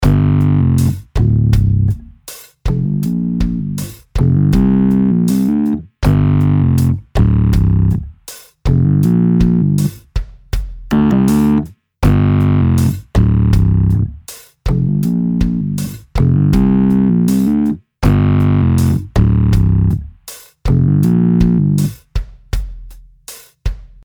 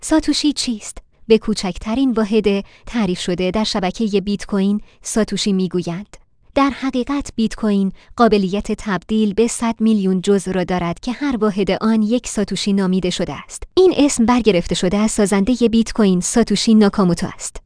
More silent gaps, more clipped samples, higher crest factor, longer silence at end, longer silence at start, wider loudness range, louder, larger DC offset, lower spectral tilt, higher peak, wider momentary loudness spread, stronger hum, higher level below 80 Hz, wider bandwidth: neither; neither; about the same, 12 dB vs 16 dB; first, 0.2 s vs 0.05 s; about the same, 0 s vs 0 s; about the same, 3 LU vs 4 LU; first, -14 LUFS vs -17 LUFS; neither; first, -8 dB/octave vs -5 dB/octave; about the same, 0 dBFS vs 0 dBFS; first, 14 LU vs 8 LU; neither; first, -22 dBFS vs -38 dBFS; first, over 20 kHz vs 10.5 kHz